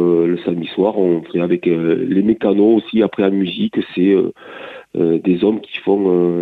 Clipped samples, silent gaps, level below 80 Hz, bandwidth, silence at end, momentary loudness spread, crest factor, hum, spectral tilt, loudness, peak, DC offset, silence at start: under 0.1%; none; -58 dBFS; 4.5 kHz; 0 s; 7 LU; 12 dB; none; -9.5 dB/octave; -16 LUFS; -2 dBFS; under 0.1%; 0 s